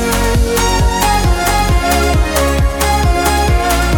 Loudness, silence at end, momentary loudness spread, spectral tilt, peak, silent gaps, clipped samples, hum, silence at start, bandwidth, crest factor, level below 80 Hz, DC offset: -13 LUFS; 0 s; 1 LU; -4.5 dB/octave; -2 dBFS; none; under 0.1%; none; 0 s; 18.5 kHz; 10 dB; -16 dBFS; under 0.1%